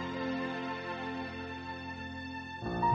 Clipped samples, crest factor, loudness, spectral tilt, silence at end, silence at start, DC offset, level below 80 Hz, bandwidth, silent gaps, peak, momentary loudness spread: under 0.1%; 18 dB; -38 LUFS; -6.5 dB/octave; 0 s; 0 s; under 0.1%; -58 dBFS; 7.8 kHz; none; -18 dBFS; 6 LU